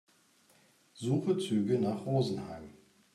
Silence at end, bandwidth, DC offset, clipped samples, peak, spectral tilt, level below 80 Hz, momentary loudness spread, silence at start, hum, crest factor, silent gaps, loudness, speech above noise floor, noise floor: 0.4 s; 13 kHz; under 0.1%; under 0.1%; -18 dBFS; -7.5 dB/octave; -70 dBFS; 15 LU; 0.95 s; none; 16 dB; none; -32 LUFS; 35 dB; -66 dBFS